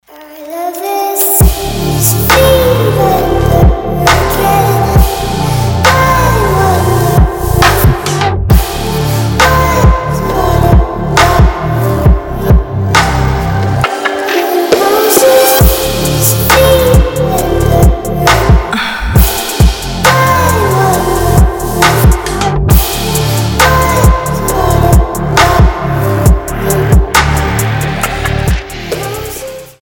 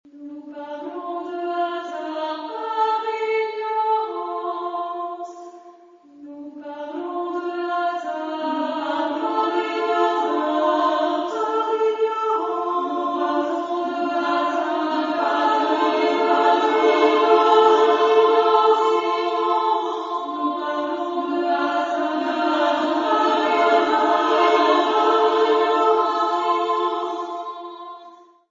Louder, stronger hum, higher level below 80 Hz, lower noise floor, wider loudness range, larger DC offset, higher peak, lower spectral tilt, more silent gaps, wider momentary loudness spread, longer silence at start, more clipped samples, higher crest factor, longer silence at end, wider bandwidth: first, -10 LUFS vs -20 LUFS; neither; first, -14 dBFS vs -76 dBFS; second, -29 dBFS vs -48 dBFS; second, 2 LU vs 10 LU; neither; first, 0 dBFS vs -4 dBFS; first, -5 dB/octave vs -3 dB/octave; neither; second, 7 LU vs 14 LU; about the same, 0.15 s vs 0.15 s; first, 0.5% vs under 0.1%; second, 8 dB vs 18 dB; second, 0.1 s vs 0.35 s; first, 19.5 kHz vs 7.6 kHz